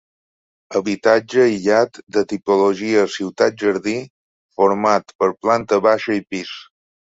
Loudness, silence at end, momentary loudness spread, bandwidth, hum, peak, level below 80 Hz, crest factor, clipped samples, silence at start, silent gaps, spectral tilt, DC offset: -18 LUFS; 0.5 s; 9 LU; 8 kHz; none; 0 dBFS; -60 dBFS; 18 dB; under 0.1%; 0.7 s; 2.03-2.07 s, 4.10-4.49 s, 5.15-5.19 s; -5 dB/octave; under 0.1%